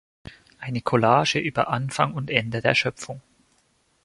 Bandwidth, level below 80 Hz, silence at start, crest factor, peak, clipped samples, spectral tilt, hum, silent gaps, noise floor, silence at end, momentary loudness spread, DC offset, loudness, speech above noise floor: 11.5 kHz; -58 dBFS; 0.25 s; 24 dB; 0 dBFS; under 0.1%; -5 dB/octave; none; none; -66 dBFS; 0.85 s; 18 LU; under 0.1%; -23 LUFS; 43 dB